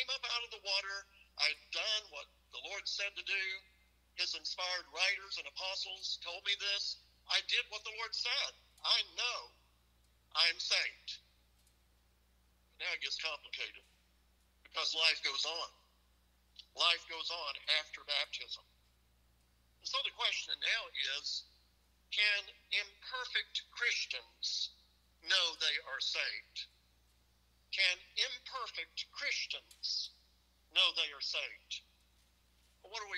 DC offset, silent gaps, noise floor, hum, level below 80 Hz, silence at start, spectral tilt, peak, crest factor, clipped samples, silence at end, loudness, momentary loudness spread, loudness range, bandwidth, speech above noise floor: under 0.1%; none; -71 dBFS; none; -74 dBFS; 0 s; 2 dB/octave; -14 dBFS; 26 dB; under 0.1%; 0 s; -36 LUFS; 14 LU; 3 LU; 15.5 kHz; 33 dB